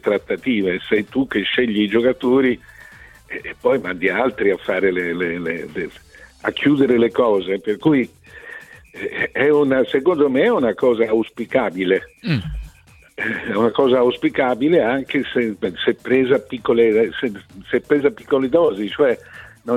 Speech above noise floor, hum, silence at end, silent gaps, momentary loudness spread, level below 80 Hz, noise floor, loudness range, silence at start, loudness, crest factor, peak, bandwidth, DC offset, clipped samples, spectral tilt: 30 dB; none; 0 s; none; 12 LU; -46 dBFS; -48 dBFS; 3 LU; 0.05 s; -18 LUFS; 16 dB; -4 dBFS; 12.5 kHz; under 0.1%; under 0.1%; -7 dB/octave